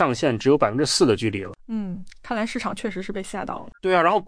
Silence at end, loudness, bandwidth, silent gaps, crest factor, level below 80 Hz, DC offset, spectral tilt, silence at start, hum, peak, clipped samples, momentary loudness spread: 0 s; -23 LUFS; 10.5 kHz; none; 18 dB; -50 dBFS; under 0.1%; -4.5 dB/octave; 0 s; none; -4 dBFS; under 0.1%; 13 LU